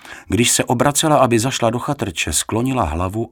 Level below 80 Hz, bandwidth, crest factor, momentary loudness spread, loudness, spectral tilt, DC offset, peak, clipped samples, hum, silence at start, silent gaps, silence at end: -40 dBFS; 19 kHz; 18 dB; 8 LU; -17 LUFS; -4 dB/octave; under 0.1%; 0 dBFS; under 0.1%; none; 0.05 s; none; 0.05 s